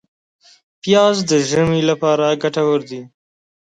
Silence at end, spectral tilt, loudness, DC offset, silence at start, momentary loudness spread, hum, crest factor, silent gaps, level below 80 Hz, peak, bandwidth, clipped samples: 0.55 s; -5 dB/octave; -16 LUFS; under 0.1%; 0.85 s; 12 LU; none; 16 dB; none; -54 dBFS; -2 dBFS; 9.4 kHz; under 0.1%